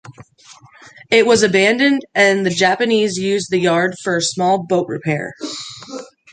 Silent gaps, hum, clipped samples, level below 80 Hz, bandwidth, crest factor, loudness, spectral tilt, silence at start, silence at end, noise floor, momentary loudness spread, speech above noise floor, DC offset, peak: none; none; under 0.1%; -60 dBFS; 9.4 kHz; 16 dB; -15 LUFS; -4 dB/octave; 0.05 s; 0.25 s; -45 dBFS; 15 LU; 30 dB; under 0.1%; -2 dBFS